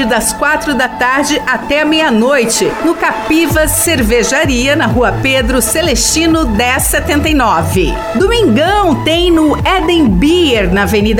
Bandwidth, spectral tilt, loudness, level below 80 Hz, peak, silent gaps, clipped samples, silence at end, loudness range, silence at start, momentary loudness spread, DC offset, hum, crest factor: 17.5 kHz; -4 dB/octave; -10 LUFS; -24 dBFS; 0 dBFS; none; under 0.1%; 0 s; 1 LU; 0 s; 3 LU; under 0.1%; none; 10 dB